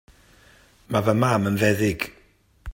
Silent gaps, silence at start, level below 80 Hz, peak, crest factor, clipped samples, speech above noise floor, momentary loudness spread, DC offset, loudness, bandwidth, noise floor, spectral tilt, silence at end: none; 0.9 s; -54 dBFS; -4 dBFS; 20 dB; under 0.1%; 37 dB; 11 LU; under 0.1%; -22 LUFS; 16.5 kHz; -58 dBFS; -6 dB/octave; 0 s